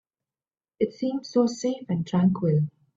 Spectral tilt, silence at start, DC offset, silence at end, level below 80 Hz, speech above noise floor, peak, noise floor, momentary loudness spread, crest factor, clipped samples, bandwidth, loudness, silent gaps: -7.5 dB/octave; 0.8 s; under 0.1%; 0.25 s; -64 dBFS; over 66 dB; -10 dBFS; under -90 dBFS; 7 LU; 16 dB; under 0.1%; 7.8 kHz; -25 LUFS; none